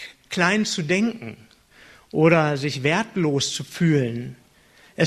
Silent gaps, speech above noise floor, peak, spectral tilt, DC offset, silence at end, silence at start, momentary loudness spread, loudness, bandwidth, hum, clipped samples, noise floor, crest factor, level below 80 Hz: none; 33 dB; -2 dBFS; -5 dB/octave; under 0.1%; 0 s; 0 s; 16 LU; -21 LUFS; 13.5 kHz; none; under 0.1%; -54 dBFS; 20 dB; -60 dBFS